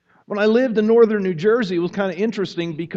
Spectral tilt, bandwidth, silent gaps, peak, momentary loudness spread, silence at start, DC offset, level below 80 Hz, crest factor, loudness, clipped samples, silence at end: -7 dB/octave; 7.4 kHz; none; -4 dBFS; 10 LU; 0.3 s; under 0.1%; -64 dBFS; 16 dB; -19 LUFS; under 0.1%; 0 s